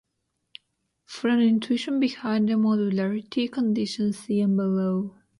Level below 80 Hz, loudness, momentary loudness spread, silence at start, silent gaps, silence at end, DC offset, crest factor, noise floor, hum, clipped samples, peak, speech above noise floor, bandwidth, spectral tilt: -70 dBFS; -24 LUFS; 6 LU; 1.1 s; none; 0.3 s; under 0.1%; 14 dB; -77 dBFS; none; under 0.1%; -12 dBFS; 54 dB; 11.5 kHz; -6.5 dB/octave